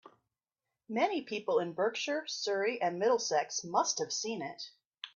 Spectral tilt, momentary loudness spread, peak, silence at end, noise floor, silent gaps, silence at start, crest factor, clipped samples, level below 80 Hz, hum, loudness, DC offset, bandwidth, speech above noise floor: -2.5 dB/octave; 9 LU; -16 dBFS; 0.05 s; under -90 dBFS; 4.86-4.90 s; 0.05 s; 20 dB; under 0.1%; -84 dBFS; none; -33 LUFS; under 0.1%; 7.6 kHz; over 57 dB